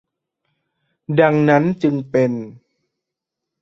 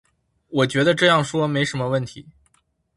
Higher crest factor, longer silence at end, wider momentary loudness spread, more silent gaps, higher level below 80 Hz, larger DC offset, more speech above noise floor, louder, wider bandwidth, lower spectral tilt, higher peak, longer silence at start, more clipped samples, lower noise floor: about the same, 18 dB vs 22 dB; first, 1.1 s vs 0.65 s; about the same, 10 LU vs 10 LU; neither; about the same, -60 dBFS vs -58 dBFS; neither; first, 67 dB vs 45 dB; first, -17 LUFS vs -20 LUFS; second, 7.2 kHz vs 11.5 kHz; first, -8.5 dB/octave vs -5 dB/octave; about the same, -2 dBFS vs 0 dBFS; first, 1.1 s vs 0.5 s; neither; first, -83 dBFS vs -65 dBFS